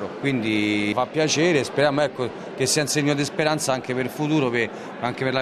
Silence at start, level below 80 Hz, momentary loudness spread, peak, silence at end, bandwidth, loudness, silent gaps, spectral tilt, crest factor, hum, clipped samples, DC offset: 0 s; -62 dBFS; 7 LU; -6 dBFS; 0 s; 13.5 kHz; -22 LUFS; none; -4 dB/octave; 16 dB; none; under 0.1%; under 0.1%